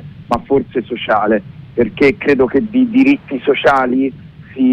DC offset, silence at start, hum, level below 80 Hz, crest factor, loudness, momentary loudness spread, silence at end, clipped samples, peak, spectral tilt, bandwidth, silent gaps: under 0.1%; 0 s; none; -44 dBFS; 12 dB; -14 LUFS; 9 LU; 0 s; under 0.1%; -2 dBFS; -7 dB/octave; 7.6 kHz; none